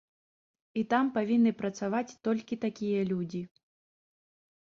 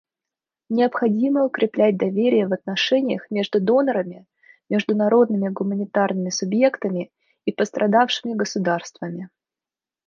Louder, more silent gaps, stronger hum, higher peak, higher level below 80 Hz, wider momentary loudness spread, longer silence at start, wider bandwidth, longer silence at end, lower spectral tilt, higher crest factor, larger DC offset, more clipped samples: second, -31 LUFS vs -21 LUFS; neither; neither; second, -14 dBFS vs -4 dBFS; about the same, -72 dBFS vs -72 dBFS; about the same, 11 LU vs 11 LU; about the same, 0.75 s vs 0.7 s; about the same, 7.2 kHz vs 7.4 kHz; first, 1.2 s vs 0.8 s; first, -7 dB/octave vs -5.5 dB/octave; about the same, 18 dB vs 18 dB; neither; neither